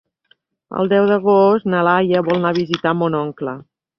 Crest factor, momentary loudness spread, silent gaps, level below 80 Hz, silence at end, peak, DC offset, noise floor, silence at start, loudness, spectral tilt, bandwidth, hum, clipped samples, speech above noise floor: 16 dB; 14 LU; none; -60 dBFS; 0.4 s; -2 dBFS; under 0.1%; -60 dBFS; 0.7 s; -16 LUFS; -7.5 dB/octave; 6.4 kHz; none; under 0.1%; 44 dB